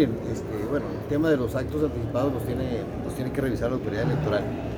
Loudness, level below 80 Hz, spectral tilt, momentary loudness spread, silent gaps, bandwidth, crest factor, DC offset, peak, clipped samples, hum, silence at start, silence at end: -27 LUFS; -42 dBFS; -7.5 dB/octave; 7 LU; none; over 20 kHz; 16 dB; under 0.1%; -10 dBFS; under 0.1%; none; 0 s; 0 s